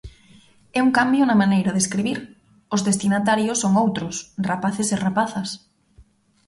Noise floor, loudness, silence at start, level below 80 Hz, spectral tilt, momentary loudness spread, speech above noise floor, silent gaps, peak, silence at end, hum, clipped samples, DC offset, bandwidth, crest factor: -54 dBFS; -21 LUFS; 0.05 s; -54 dBFS; -4.5 dB/octave; 11 LU; 34 dB; none; -6 dBFS; 0.45 s; none; under 0.1%; under 0.1%; 11.5 kHz; 16 dB